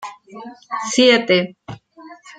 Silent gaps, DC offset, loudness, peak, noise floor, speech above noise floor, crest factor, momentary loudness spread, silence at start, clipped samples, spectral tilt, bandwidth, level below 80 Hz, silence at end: none; under 0.1%; -15 LUFS; -2 dBFS; -42 dBFS; 25 dB; 18 dB; 25 LU; 0 s; under 0.1%; -3.5 dB/octave; 9.4 kHz; -62 dBFS; 0.05 s